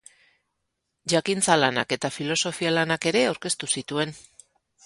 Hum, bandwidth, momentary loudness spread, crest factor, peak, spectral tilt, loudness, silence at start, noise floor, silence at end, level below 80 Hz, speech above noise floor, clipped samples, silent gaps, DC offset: none; 11.5 kHz; 8 LU; 24 dB; -2 dBFS; -3 dB/octave; -24 LUFS; 1.05 s; -79 dBFS; 0.65 s; -66 dBFS; 54 dB; under 0.1%; none; under 0.1%